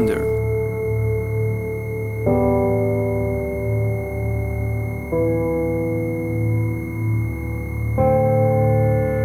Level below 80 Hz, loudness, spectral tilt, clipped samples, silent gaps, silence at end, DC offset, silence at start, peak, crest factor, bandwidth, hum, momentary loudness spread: -34 dBFS; -21 LUFS; -9.5 dB/octave; under 0.1%; none; 0 s; 0.3%; 0 s; -6 dBFS; 14 dB; 14 kHz; none; 7 LU